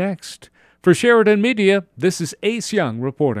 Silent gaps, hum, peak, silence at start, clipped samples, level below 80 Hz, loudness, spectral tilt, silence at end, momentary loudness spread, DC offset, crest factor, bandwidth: none; none; -2 dBFS; 0 s; under 0.1%; -60 dBFS; -17 LUFS; -5.5 dB/octave; 0 s; 10 LU; under 0.1%; 16 dB; 14.5 kHz